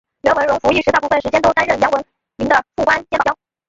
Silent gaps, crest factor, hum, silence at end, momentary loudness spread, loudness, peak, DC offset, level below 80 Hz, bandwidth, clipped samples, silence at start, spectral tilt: none; 16 dB; none; 0.35 s; 4 LU; -16 LUFS; 0 dBFS; under 0.1%; -44 dBFS; 7.8 kHz; under 0.1%; 0.25 s; -4.5 dB/octave